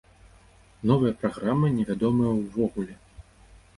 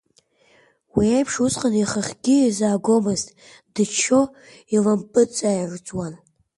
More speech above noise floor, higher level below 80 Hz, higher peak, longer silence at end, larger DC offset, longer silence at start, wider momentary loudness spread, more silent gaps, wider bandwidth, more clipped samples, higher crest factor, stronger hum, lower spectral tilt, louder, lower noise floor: second, 31 dB vs 40 dB; about the same, -52 dBFS vs -52 dBFS; about the same, -8 dBFS vs -6 dBFS; first, 0.55 s vs 0.4 s; neither; about the same, 0.85 s vs 0.95 s; second, 7 LU vs 12 LU; neither; about the same, 11.5 kHz vs 11.5 kHz; neither; about the same, 18 dB vs 16 dB; neither; first, -9 dB/octave vs -4.5 dB/octave; second, -25 LUFS vs -21 LUFS; second, -55 dBFS vs -60 dBFS